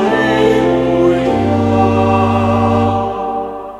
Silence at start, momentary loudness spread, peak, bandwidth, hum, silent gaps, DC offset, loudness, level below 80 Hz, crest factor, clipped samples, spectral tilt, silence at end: 0 s; 7 LU; 0 dBFS; 12 kHz; none; none; under 0.1%; -13 LUFS; -36 dBFS; 12 dB; under 0.1%; -7.5 dB/octave; 0 s